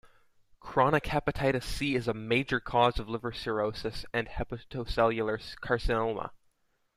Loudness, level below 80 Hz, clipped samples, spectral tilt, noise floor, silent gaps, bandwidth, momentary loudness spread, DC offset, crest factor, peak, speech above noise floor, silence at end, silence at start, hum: -30 LUFS; -44 dBFS; under 0.1%; -6 dB/octave; -72 dBFS; none; 15 kHz; 11 LU; under 0.1%; 20 dB; -10 dBFS; 42 dB; 0.6 s; 0.05 s; none